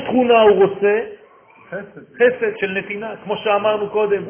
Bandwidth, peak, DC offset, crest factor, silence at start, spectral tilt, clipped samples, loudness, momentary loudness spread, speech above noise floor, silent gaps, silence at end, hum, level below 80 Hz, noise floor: 3.5 kHz; -2 dBFS; under 0.1%; 16 dB; 0 s; -9 dB/octave; under 0.1%; -17 LUFS; 20 LU; 30 dB; none; 0 s; none; -58 dBFS; -47 dBFS